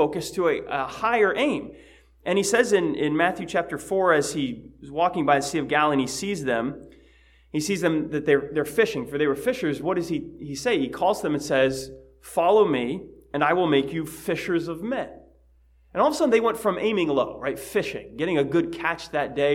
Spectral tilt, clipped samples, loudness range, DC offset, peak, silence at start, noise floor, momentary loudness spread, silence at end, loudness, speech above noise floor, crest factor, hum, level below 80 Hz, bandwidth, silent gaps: -4.5 dB/octave; under 0.1%; 2 LU; under 0.1%; -4 dBFS; 0 s; -57 dBFS; 10 LU; 0 s; -24 LUFS; 34 dB; 20 dB; none; -56 dBFS; 16.5 kHz; none